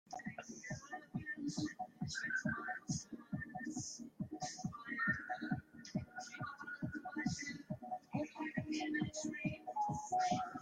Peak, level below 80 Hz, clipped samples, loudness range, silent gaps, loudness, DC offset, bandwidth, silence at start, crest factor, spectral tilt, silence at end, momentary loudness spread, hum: -24 dBFS; -72 dBFS; under 0.1%; 2 LU; none; -43 LUFS; under 0.1%; 13.5 kHz; 0.1 s; 18 dB; -4.5 dB/octave; 0 s; 10 LU; none